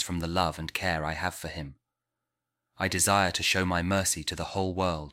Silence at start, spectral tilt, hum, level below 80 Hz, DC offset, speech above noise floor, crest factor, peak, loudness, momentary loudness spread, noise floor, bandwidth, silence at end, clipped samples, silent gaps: 0 s; -3.5 dB/octave; none; -48 dBFS; under 0.1%; 58 dB; 20 dB; -10 dBFS; -28 LUFS; 10 LU; -86 dBFS; 16.5 kHz; 0 s; under 0.1%; none